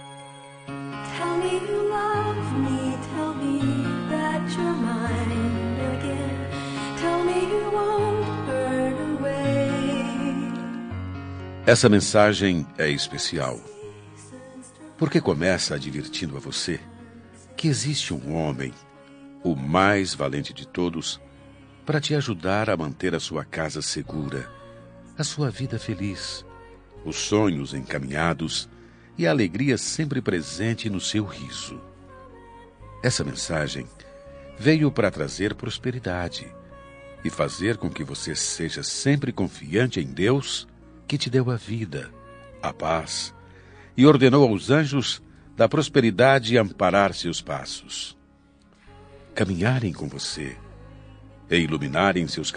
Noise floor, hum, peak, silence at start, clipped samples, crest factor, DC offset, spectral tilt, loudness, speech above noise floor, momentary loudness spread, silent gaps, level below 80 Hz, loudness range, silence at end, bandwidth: -56 dBFS; none; -2 dBFS; 0 s; under 0.1%; 24 dB; under 0.1%; -5 dB/octave; -24 LUFS; 32 dB; 16 LU; none; -52 dBFS; 8 LU; 0 s; 10 kHz